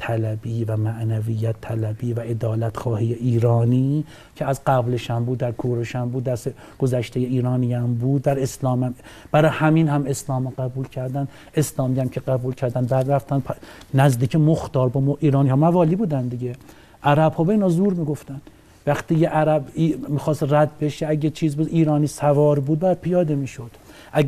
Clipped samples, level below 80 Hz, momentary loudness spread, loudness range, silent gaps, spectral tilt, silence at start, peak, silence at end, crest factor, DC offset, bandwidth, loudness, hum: under 0.1%; -50 dBFS; 10 LU; 4 LU; none; -7.5 dB/octave; 0 s; -4 dBFS; 0 s; 18 dB; under 0.1%; 14.5 kHz; -21 LUFS; none